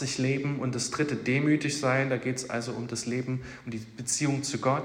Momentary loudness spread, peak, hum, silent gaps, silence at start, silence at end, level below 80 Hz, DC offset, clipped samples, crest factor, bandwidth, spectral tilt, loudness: 9 LU; -12 dBFS; none; none; 0 s; 0 s; -62 dBFS; under 0.1%; under 0.1%; 16 dB; 16 kHz; -4.5 dB/octave; -29 LUFS